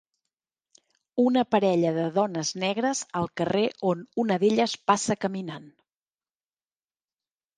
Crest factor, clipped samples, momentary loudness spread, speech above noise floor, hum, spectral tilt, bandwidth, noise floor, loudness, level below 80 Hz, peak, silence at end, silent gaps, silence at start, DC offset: 22 dB; under 0.1%; 8 LU; over 65 dB; none; -5 dB/octave; 10 kHz; under -90 dBFS; -25 LUFS; -68 dBFS; -4 dBFS; 1.9 s; none; 1.15 s; under 0.1%